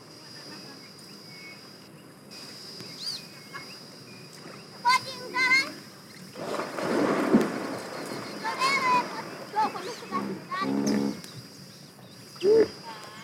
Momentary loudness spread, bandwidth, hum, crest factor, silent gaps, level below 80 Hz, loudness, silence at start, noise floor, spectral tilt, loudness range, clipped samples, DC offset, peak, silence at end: 22 LU; 16.5 kHz; none; 22 dB; none; -72 dBFS; -27 LUFS; 0 s; -49 dBFS; -4 dB/octave; 13 LU; under 0.1%; under 0.1%; -8 dBFS; 0 s